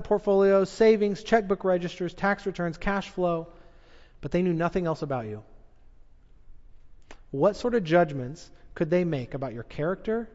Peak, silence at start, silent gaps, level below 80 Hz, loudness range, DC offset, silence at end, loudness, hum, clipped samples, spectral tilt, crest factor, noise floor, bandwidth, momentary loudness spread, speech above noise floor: -8 dBFS; 0 s; none; -48 dBFS; 7 LU; under 0.1%; 0.05 s; -26 LUFS; none; under 0.1%; -7 dB/octave; 18 dB; -51 dBFS; 8 kHz; 15 LU; 26 dB